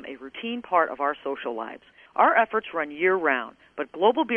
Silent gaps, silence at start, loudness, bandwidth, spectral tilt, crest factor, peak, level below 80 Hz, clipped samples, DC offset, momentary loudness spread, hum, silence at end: none; 0 s; -25 LUFS; 3.8 kHz; -6.5 dB/octave; 20 dB; -6 dBFS; -70 dBFS; under 0.1%; under 0.1%; 15 LU; none; 0 s